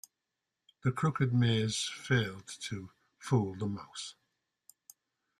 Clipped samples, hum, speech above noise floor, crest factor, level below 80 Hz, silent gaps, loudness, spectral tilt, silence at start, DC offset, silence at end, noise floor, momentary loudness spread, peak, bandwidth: under 0.1%; none; 55 dB; 20 dB; -68 dBFS; none; -33 LUFS; -5 dB/octave; 0.85 s; under 0.1%; 1.25 s; -87 dBFS; 15 LU; -16 dBFS; 13 kHz